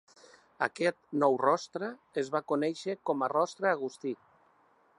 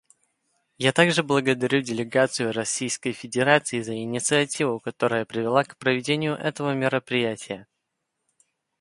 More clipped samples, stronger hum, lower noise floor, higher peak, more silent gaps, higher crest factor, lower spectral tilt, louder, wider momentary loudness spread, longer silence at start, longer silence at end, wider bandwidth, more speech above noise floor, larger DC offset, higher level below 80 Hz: neither; neither; second, -66 dBFS vs -79 dBFS; second, -12 dBFS vs -4 dBFS; neither; about the same, 20 dB vs 22 dB; about the same, -5 dB/octave vs -4 dB/octave; second, -31 LUFS vs -24 LUFS; about the same, 10 LU vs 8 LU; second, 0.6 s vs 0.8 s; second, 0.85 s vs 1.15 s; about the same, 11 kHz vs 11.5 kHz; second, 36 dB vs 56 dB; neither; second, -84 dBFS vs -66 dBFS